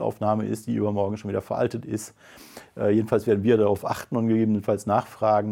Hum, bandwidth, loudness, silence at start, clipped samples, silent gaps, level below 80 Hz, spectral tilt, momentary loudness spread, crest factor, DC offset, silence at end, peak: none; 16.5 kHz; -24 LUFS; 0 s; under 0.1%; none; -64 dBFS; -7.5 dB/octave; 12 LU; 18 dB; under 0.1%; 0 s; -6 dBFS